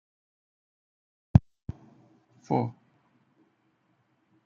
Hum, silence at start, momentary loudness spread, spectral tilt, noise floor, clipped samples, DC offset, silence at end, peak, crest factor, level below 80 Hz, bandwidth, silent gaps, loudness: none; 1.35 s; 20 LU; -10 dB/octave; -71 dBFS; under 0.1%; under 0.1%; 1.75 s; -2 dBFS; 30 dB; -48 dBFS; 6.8 kHz; none; -27 LUFS